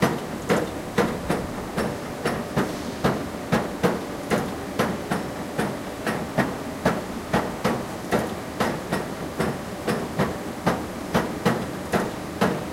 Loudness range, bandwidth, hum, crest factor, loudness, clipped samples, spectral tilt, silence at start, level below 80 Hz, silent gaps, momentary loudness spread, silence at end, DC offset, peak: 1 LU; 16 kHz; none; 20 dB; -26 LUFS; under 0.1%; -5.5 dB/octave; 0 s; -46 dBFS; none; 5 LU; 0 s; under 0.1%; -6 dBFS